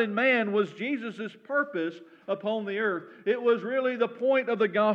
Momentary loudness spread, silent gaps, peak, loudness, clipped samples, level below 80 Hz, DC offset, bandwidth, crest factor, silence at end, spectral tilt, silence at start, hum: 10 LU; none; -12 dBFS; -28 LUFS; under 0.1%; under -90 dBFS; under 0.1%; 7.6 kHz; 16 dB; 0 s; -7 dB/octave; 0 s; none